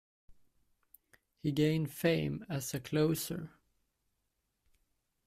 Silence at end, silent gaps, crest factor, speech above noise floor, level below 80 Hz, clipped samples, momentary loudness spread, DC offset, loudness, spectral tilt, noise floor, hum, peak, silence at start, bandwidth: 1.8 s; none; 20 dB; 49 dB; -66 dBFS; under 0.1%; 9 LU; under 0.1%; -34 LUFS; -5.5 dB/octave; -82 dBFS; none; -18 dBFS; 0.3 s; 16 kHz